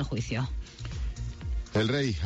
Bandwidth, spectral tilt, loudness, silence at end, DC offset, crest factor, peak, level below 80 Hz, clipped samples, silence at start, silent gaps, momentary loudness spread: 8.4 kHz; -6 dB/octave; -32 LUFS; 0 s; under 0.1%; 14 dB; -16 dBFS; -38 dBFS; under 0.1%; 0 s; none; 11 LU